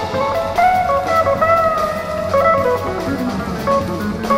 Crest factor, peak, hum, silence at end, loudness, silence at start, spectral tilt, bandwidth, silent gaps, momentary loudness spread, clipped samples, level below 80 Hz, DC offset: 14 dB; -2 dBFS; none; 0 s; -16 LUFS; 0 s; -6 dB/octave; 16 kHz; none; 7 LU; under 0.1%; -38 dBFS; under 0.1%